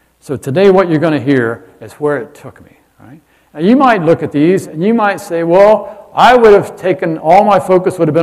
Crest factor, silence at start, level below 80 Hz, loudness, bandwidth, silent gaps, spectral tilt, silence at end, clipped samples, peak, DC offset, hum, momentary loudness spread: 10 dB; 0.3 s; -48 dBFS; -10 LUFS; 14 kHz; none; -7 dB/octave; 0 s; 2%; 0 dBFS; under 0.1%; none; 11 LU